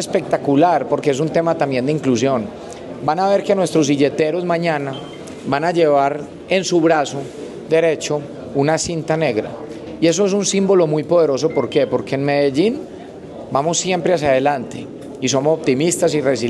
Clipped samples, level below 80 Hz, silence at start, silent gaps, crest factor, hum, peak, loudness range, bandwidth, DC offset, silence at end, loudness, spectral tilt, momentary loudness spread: under 0.1%; -54 dBFS; 0 s; none; 14 dB; none; -2 dBFS; 2 LU; 12.5 kHz; under 0.1%; 0 s; -17 LUFS; -5 dB/octave; 15 LU